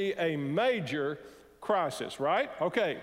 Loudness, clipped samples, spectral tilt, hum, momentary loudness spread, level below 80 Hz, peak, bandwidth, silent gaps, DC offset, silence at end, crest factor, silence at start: -31 LUFS; under 0.1%; -5.5 dB/octave; none; 6 LU; -70 dBFS; -14 dBFS; 16 kHz; none; under 0.1%; 0 s; 16 dB; 0 s